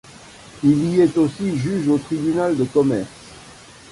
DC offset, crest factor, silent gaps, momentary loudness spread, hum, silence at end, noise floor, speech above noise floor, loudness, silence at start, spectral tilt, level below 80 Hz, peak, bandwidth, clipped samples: under 0.1%; 16 dB; none; 10 LU; none; 0.35 s; -43 dBFS; 25 dB; -19 LUFS; 0.2 s; -7.5 dB/octave; -52 dBFS; -4 dBFS; 11.5 kHz; under 0.1%